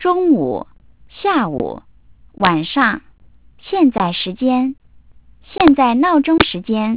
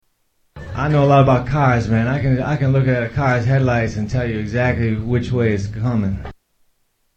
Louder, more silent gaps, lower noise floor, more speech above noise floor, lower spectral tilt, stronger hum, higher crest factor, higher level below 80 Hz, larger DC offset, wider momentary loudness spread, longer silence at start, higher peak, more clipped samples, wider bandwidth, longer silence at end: about the same, -16 LUFS vs -18 LUFS; neither; second, -48 dBFS vs -64 dBFS; second, 33 dB vs 47 dB; first, -10 dB/octave vs -8 dB/octave; neither; about the same, 16 dB vs 18 dB; second, -44 dBFS vs -36 dBFS; first, 0.4% vs under 0.1%; first, 11 LU vs 8 LU; second, 0 s vs 0.55 s; about the same, 0 dBFS vs 0 dBFS; neither; second, 4 kHz vs 7.4 kHz; second, 0 s vs 0.85 s